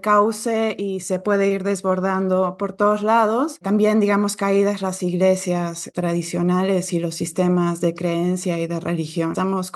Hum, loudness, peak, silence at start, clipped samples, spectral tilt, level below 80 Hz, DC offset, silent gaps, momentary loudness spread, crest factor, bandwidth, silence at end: none; -20 LUFS; -6 dBFS; 0.05 s; under 0.1%; -6 dB/octave; -66 dBFS; under 0.1%; none; 7 LU; 14 dB; 12.5 kHz; 0.05 s